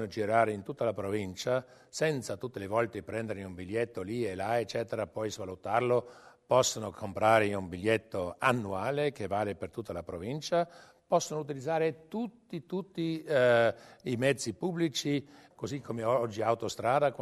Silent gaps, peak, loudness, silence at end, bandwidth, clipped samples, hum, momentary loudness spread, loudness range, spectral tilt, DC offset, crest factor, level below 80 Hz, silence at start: none; -10 dBFS; -32 LUFS; 0 s; 13.5 kHz; under 0.1%; none; 12 LU; 4 LU; -5 dB/octave; under 0.1%; 20 dB; -66 dBFS; 0 s